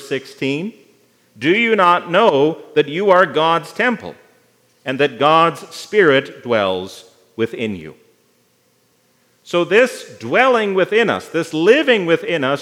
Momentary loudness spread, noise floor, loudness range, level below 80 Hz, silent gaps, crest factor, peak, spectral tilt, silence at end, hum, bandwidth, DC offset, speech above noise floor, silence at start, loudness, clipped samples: 13 LU; -59 dBFS; 6 LU; -70 dBFS; none; 16 dB; 0 dBFS; -5 dB/octave; 0 s; none; 14.5 kHz; under 0.1%; 43 dB; 0 s; -16 LUFS; under 0.1%